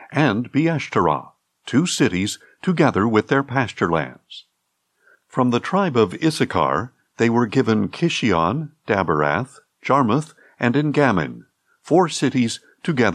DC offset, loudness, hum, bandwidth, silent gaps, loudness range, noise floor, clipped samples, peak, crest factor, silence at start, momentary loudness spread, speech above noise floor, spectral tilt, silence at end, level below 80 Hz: under 0.1%; -20 LUFS; none; 13 kHz; none; 2 LU; -72 dBFS; under 0.1%; -4 dBFS; 16 dB; 0 s; 10 LU; 53 dB; -5.5 dB/octave; 0 s; -58 dBFS